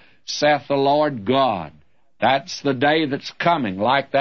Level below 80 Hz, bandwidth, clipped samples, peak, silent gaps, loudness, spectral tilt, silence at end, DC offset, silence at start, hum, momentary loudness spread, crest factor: -62 dBFS; 7.2 kHz; under 0.1%; -4 dBFS; none; -20 LUFS; -5 dB/octave; 0 s; 0.2%; 0.3 s; none; 6 LU; 16 dB